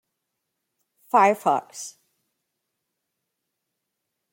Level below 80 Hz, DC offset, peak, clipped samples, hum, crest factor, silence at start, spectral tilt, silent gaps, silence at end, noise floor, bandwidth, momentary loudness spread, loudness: -84 dBFS; under 0.1%; -4 dBFS; under 0.1%; none; 24 dB; 1.15 s; -4 dB/octave; none; 2.45 s; -81 dBFS; 16.5 kHz; 19 LU; -21 LUFS